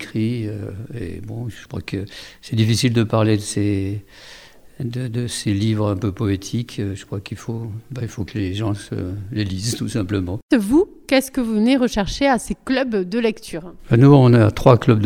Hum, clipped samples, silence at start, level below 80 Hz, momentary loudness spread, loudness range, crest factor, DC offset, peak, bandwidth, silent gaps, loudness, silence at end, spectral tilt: none; under 0.1%; 0 s; -42 dBFS; 17 LU; 9 LU; 20 dB; under 0.1%; 0 dBFS; 16 kHz; 10.42-10.49 s; -19 LUFS; 0 s; -6.5 dB/octave